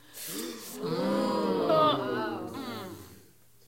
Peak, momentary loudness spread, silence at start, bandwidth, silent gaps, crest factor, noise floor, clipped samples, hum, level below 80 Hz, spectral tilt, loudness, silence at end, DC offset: -12 dBFS; 15 LU; 0.1 s; 16.5 kHz; none; 20 dB; -59 dBFS; under 0.1%; none; -70 dBFS; -5 dB/octave; -30 LUFS; 0.5 s; under 0.1%